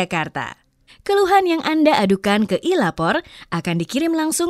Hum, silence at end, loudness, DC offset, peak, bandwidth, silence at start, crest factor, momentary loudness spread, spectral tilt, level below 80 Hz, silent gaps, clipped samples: none; 0 s; -19 LUFS; under 0.1%; -2 dBFS; 15.5 kHz; 0 s; 18 dB; 11 LU; -4.5 dB/octave; -54 dBFS; none; under 0.1%